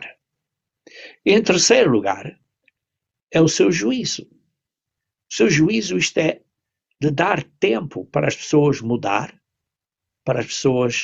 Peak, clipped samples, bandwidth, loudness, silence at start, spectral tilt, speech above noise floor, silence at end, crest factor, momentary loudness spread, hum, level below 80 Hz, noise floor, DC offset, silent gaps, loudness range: -2 dBFS; under 0.1%; 8.4 kHz; -19 LUFS; 0 s; -4.5 dB/octave; 67 dB; 0 s; 18 dB; 13 LU; none; -56 dBFS; -85 dBFS; under 0.1%; 3.23-3.27 s; 4 LU